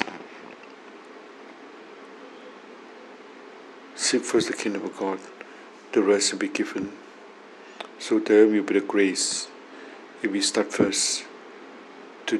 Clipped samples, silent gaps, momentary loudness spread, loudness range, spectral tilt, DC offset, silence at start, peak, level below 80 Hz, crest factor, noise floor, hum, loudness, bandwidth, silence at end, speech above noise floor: under 0.1%; none; 23 LU; 19 LU; -2.5 dB/octave; under 0.1%; 0 s; -4 dBFS; -70 dBFS; 24 dB; -46 dBFS; none; -24 LUFS; 12.5 kHz; 0 s; 23 dB